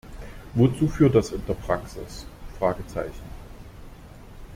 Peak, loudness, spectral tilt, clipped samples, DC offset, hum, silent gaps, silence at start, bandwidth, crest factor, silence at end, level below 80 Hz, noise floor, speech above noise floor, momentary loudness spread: -6 dBFS; -24 LUFS; -7.5 dB/octave; under 0.1%; under 0.1%; none; none; 0.05 s; 16 kHz; 20 dB; 0 s; -40 dBFS; -44 dBFS; 20 dB; 26 LU